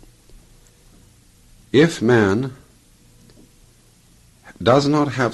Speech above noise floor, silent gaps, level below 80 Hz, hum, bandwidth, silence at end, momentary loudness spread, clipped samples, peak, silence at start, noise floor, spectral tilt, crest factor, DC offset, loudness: 36 dB; none; -52 dBFS; none; 12.5 kHz; 0 s; 7 LU; under 0.1%; -2 dBFS; 1.75 s; -52 dBFS; -6 dB/octave; 20 dB; under 0.1%; -17 LUFS